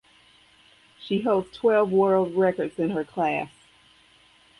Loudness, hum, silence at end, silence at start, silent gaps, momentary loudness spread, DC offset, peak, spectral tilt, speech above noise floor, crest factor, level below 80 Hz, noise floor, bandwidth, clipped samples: -24 LUFS; none; 1.1 s; 1 s; none; 9 LU; under 0.1%; -10 dBFS; -7.5 dB/octave; 34 dB; 16 dB; -64 dBFS; -57 dBFS; 11 kHz; under 0.1%